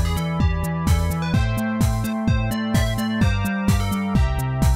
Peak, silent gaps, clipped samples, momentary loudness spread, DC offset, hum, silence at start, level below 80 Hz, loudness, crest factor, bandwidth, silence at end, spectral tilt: -6 dBFS; none; under 0.1%; 2 LU; under 0.1%; none; 0 s; -26 dBFS; -22 LUFS; 14 dB; 16 kHz; 0 s; -6 dB/octave